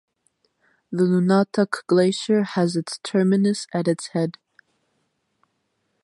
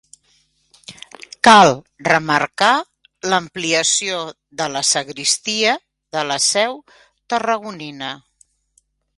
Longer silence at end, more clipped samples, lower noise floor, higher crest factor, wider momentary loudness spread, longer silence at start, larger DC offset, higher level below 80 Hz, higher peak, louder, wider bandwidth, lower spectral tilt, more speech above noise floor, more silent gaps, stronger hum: first, 1.75 s vs 1 s; neither; first, -73 dBFS vs -62 dBFS; about the same, 18 dB vs 20 dB; second, 7 LU vs 18 LU; about the same, 0.9 s vs 0.9 s; neither; second, -70 dBFS vs -62 dBFS; second, -6 dBFS vs 0 dBFS; second, -21 LUFS vs -17 LUFS; about the same, 11.5 kHz vs 11.5 kHz; first, -6 dB/octave vs -2 dB/octave; first, 52 dB vs 45 dB; neither; neither